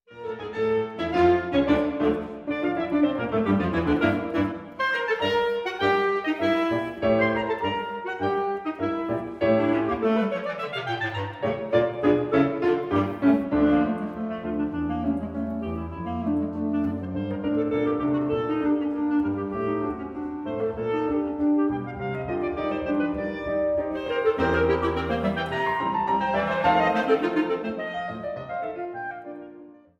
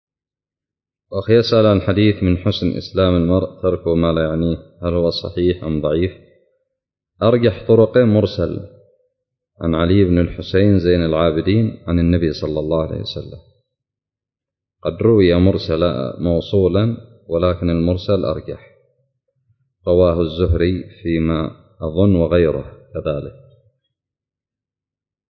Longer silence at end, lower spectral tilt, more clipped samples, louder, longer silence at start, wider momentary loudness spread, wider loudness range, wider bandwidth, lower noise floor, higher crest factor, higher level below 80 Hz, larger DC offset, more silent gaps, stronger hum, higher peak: second, 0.25 s vs 2 s; second, -7.5 dB/octave vs -9 dB/octave; neither; second, -25 LUFS vs -17 LUFS; second, 0.1 s vs 1.1 s; second, 9 LU vs 12 LU; about the same, 4 LU vs 4 LU; first, 7 kHz vs 6.2 kHz; second, -47 dBFS vs -89 dBFS; about the same, 18 dB vs 16 dB; second, -48 dBFS vs -32 dBFS; neither; neither; neither; second, -8 dBFS vs -2 dBFS